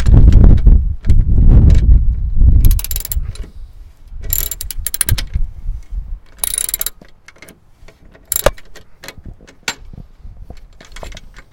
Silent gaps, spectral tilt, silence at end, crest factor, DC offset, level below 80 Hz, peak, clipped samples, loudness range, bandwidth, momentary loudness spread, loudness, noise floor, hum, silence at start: none; -5 dB/octave; 0.25 s; 12 dB; under 0.1%; -14 dBFS; 0 dBFS; 1%; 11 LU; 17.5 kHz; 24 LU; -15 LUFS; -41 dBFS; none; 0 s